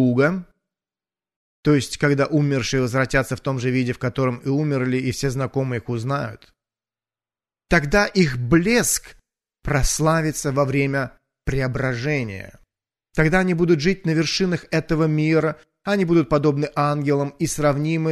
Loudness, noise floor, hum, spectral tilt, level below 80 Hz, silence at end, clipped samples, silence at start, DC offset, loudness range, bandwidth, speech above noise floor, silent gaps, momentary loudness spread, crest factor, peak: -21 LUFS; under -90 dBFS; none; -5.5 dB/octave; -38 dBFS; 0 s; under 0.1%; 0 s; under 0.1%; 4 LU; 13.5 kHz; over 70 dB; 1.36-1.63 s; 8 LU; 18 dB; -4 dBFS